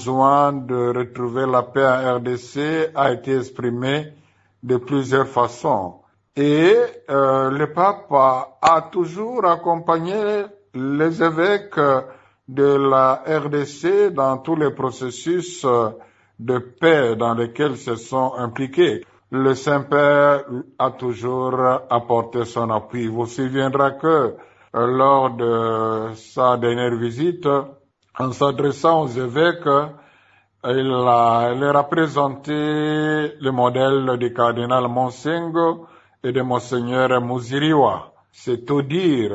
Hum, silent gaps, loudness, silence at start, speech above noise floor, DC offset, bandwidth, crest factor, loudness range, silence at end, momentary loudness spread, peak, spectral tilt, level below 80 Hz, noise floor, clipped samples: none; none; -19 LUFS; 0 s; 38 dB; under 0.1%; 8 kHz; 16 dB; 3 LU; 0 s; 9 LU; -2 dBFS; -6.5 dB/octave; -62 dBFS; -56 dBFS; under 0.1%